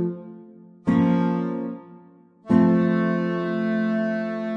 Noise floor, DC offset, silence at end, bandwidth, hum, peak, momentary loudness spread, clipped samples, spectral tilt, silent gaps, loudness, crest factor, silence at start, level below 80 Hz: -51 dBFS; under 0.1%; 0 s; 5.8 kHz; none; -6 dBFS; 14 LU; under 0.1%; -9.5 dB/octave; none; -22 LUFS; 16 dB; 0 s; -62 dBFS